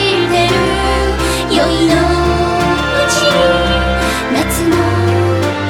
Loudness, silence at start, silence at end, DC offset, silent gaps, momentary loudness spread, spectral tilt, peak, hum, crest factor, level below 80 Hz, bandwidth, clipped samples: -12 LUFS; 0 s; 0 s; under 0.1%; none; 3 LU; -4.5 dB/octave; 0 dBFS; none; 12 dB; -24 dBFS; 18 kHz; under 0.1%